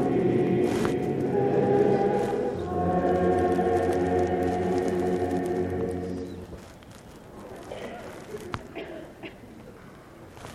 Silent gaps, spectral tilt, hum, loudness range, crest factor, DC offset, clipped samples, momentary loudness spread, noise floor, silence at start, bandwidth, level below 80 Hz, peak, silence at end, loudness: none; -7.5 dB/octave; none; 16 LU; 16 dB; under 0.1%; under 0.1%; 22 LU; -47 dBFS; 0 s; 14 kHz; -50 dBFS; -10 dBFS; 0 s; -26 LUFS